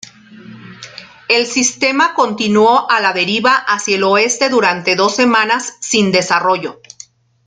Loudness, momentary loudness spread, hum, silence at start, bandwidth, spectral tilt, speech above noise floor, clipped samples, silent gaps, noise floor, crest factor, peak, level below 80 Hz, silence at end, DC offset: -13 LUFS; 8 LU; none; 0.3 s; 9.6 kHz; -2.5 dB/octave; 28 dB; under 0.1%; none; -41 dBFS; 14 dB; 0 dBFS; -62 dBFS; 0.75 s; under 0.1%